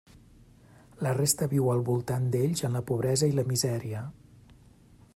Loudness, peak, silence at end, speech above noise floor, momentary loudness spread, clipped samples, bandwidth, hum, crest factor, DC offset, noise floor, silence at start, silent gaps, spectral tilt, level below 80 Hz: -28 LUFS; -10 dBFS; 1.05 s; 29 dB; 8 LU; under 0.1%; 16 kHz; none; 20 dB; under 0.1%; -56 dBFS; 1 s; none; -5.5 dB/octave; -60 dBFS